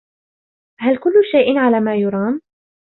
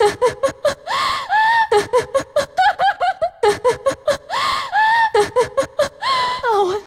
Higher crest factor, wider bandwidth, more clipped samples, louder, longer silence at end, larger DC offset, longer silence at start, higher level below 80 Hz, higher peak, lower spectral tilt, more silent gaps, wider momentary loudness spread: about the same, 14 dB vs 14 dB; second, 4.2 kHz vs 16 kHz; neither; about the same, -16 LUFS vs -17 LUFS; first, 0.5 s vs 0.05 s; neither; first, 0.8 s vs 0 s; second, -62 dBFS vs -50 dBFS; about the same, -2 dBFS vs -4 dBFS; first, -10.5 dB/octave vs -2.5 dB/octave; neither; first, 9 LU vs 6 LU